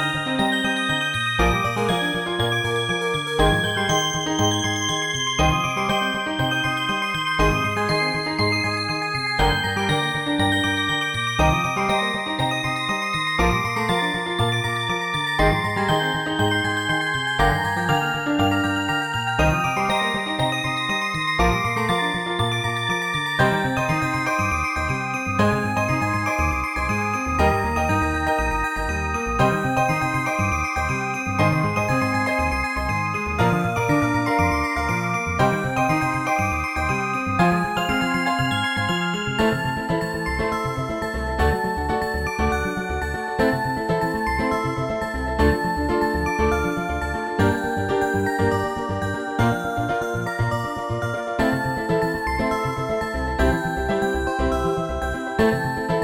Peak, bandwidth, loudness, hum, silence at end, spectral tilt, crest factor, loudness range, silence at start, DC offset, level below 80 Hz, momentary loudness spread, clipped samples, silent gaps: -6 dBFS; 17 kHz; -22 LUFS; none; 0 s; -4.5 dB/octave; 16 dB; 2 LU; 0 s; under 0.1%; -34 dBFS; 4 LU; under 0.1%; none